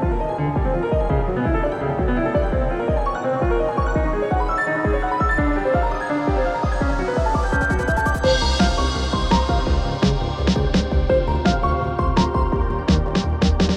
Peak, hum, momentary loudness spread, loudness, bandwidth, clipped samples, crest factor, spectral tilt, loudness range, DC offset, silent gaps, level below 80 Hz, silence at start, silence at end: -4 dBFS; none; 3 LU; -20 LUFS; 10.5 kHz; under 0.1%; 14 dB; -6.5 dB/octave; 2 LU; under 0.1%; none; -24 dBFS; 0 s; 0 s